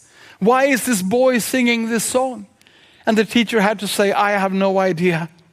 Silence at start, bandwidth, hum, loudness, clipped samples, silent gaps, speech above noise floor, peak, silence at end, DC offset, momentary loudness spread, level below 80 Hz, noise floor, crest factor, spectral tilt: 0.4 s; 15.5 kHz; none; -17 LUFS; under 0.1%; none; 34 dB; -2 dBFS; 0.25 s; under 0.1%; 5 LU; -64 dBFS; -51 dBFS; 16 dB; -4.5 dB/octave